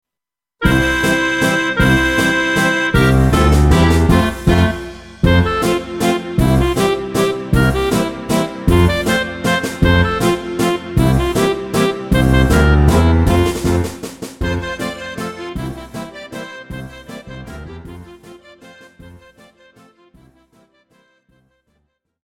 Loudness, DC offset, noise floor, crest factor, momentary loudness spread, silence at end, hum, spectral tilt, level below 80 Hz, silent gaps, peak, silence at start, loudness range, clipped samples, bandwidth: -15 LUFS; under 0.1%; -86 dBFS; 16 dB; 18 LU; 3.05 s; none; -6 dB/octave; -24 dBFS; none; 0 dBFS; 0.6 s; 16 LU; under 0.1%; 16.5 kHz